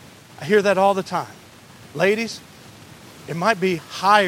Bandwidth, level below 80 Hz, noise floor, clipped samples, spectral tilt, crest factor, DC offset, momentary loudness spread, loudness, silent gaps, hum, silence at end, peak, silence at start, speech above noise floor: 16.5 kHz; -64 dBFS; -45 dBFS; under 0.1%; -4.5 dB/octave; 22 dB; under 0.1%; 19 LU; -20 LUFS; none; none; 0 s; 0 dBFS; 0.4 s; 25 dB